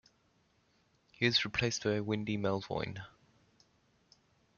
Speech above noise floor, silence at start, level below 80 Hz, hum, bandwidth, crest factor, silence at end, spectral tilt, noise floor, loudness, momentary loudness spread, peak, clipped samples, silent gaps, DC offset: 39 dB; 1.2 s; -66 dBFS; none; 7.4 kHz; 24 dB; 1.5 s; -4.5 dB/octave; -72 dBFS; -33 LUFS; 12 LU; -14 dBFS; under 0.1%; none; under 0.1%